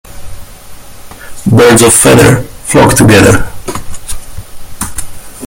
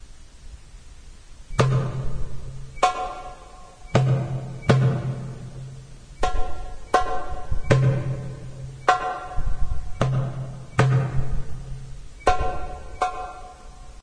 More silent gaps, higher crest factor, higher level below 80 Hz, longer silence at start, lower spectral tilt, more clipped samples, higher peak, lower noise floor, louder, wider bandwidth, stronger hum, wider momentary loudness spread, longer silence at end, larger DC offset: neither; second, 8 dB vs 22 dB; first, -26 dBFS vs -34 dBFS; about the same, 0.1 s vs 0 s; second, -4.5 dB/octave vs -6.5 dB/octave; first, 2% vs under 0.1%; about the same, 0 dBFS vs -2 dBFS; second, -27 dBFS vs -43 dBFS; first, -5 LUFS vs -25 LUFS; first, over 20 kHz vs 10 kHz; neither; about the same, 20 LU vs 19 LU; about the same, 0 s vs 0 s; neither